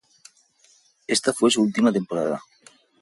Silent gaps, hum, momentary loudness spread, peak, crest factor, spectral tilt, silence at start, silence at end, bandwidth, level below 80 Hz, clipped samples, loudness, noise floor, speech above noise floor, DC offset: none; none; 11 LU; -6 dBFS; 18 dB; -4 dB/octave; 1.1 s; 0.6 s; 11.5 kHz; -66 dBFS; under 0.1%; -22 LUFS; -59 dBFS; 38 dB; under 0.1%